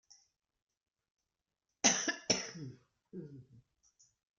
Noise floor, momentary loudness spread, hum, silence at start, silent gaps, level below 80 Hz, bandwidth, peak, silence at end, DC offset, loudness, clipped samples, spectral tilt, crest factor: under -90 dBFS; 22 LU; none; 1.85 s; none; -78 dBFS; 11 kHz; -12 dBFS; 0.8 s; under 0.1%; -32 LUFS; under 0.1%; -1 dB/octave; 28 dB